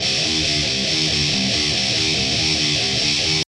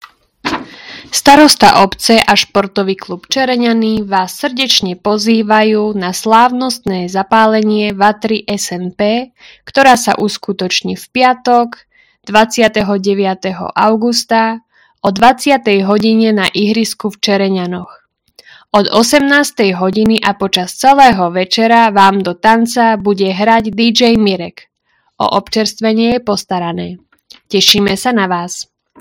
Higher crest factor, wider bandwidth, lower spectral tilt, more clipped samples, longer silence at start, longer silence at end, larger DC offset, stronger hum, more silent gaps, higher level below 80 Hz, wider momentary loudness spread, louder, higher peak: about the same, 14 dB vs 12 dB; second, 13 kHz vs over 20 kHz; second, -2 dB/octave vs -4 dB/octave; second, under 0.1% vs 1%; second, 0 s vs 0.45 s; second, 0.1 s vs 0.4 s; neither; neither; neither; first, -40 dBFS vs -46 dBFS; second, 1 LU vs 10 LU; second, -17 LUFS vs -11 LUFS; second, -6 dBFS vs 0 dBFS